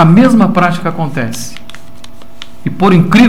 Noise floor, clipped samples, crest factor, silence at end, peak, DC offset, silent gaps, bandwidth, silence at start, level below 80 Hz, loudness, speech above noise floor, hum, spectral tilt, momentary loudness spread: -36 dBFS; under 0.1%; 10 dB; 0 s; 0 dBFS; 9%; none; 16 kHz; 0 s; -42 dBFS; -10 LUFS; 28 dB; none; -6.5 dB/octave; 23 LU